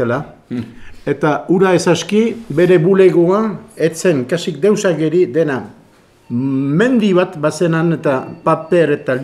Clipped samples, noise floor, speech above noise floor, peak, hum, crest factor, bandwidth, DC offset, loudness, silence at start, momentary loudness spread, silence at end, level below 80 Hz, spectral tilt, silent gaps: under 0.1%; -48 dBFS; 34 dB; 0 dBFS; none; 14 dB; 12.5 kHz; under 0.1%; -14 LUFS; 0 s; 12 LU; 0 s; -52 dBFS; -6.5 dB/octave; none